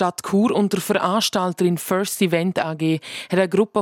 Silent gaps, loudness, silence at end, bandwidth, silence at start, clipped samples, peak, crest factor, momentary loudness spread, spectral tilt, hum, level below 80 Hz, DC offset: none; -20 LUFS; 0 s; 17 kHz; 0 s; under 0.1%; -6 dBFS; 14 dB; 4 LU; -5 dB/octave; none; -66 dBFS; under 0.1%